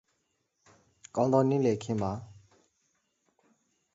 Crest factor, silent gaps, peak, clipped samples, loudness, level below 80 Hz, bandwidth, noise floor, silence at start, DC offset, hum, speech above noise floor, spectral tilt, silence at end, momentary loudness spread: 22 dB; none; -12 dBFS; under 0.1%; -29 LUFS; -62 dBFS; 8 kHz; -78 dBFS; 1.15 s; under 0.1%; none; 50 dB; -7.5 dB/octave; 1.6 s; 12 LU